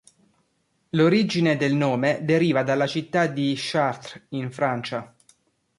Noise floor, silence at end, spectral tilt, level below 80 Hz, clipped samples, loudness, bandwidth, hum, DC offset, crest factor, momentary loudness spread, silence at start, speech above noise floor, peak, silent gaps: -70 dBFS; 0.75 s; -6.5 dB/octave; -66 dBFS; under 0.1%; -23 LUFS; 11.5 kHz; none; under 0.1%; 16 dB; 12 LU; 0.95 s; 47 dB; -8 dBFS; none